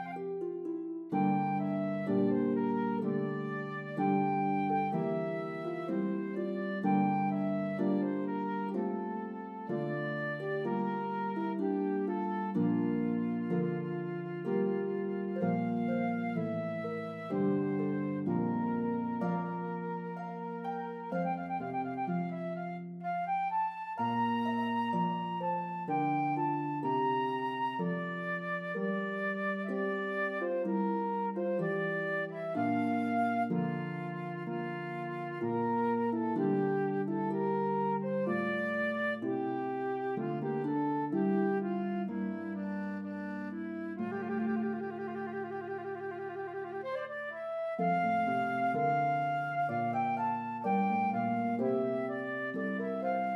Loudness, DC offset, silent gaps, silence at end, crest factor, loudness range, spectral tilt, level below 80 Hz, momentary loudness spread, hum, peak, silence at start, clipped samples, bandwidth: -34 LUFS; under 0.1%; none; 0 s; 14 dB; 4 LU; -9 dB/octave; -86 dBFS; 8 LU; none; -18 dBFS; 0 s; under 0.1%; 6 kHz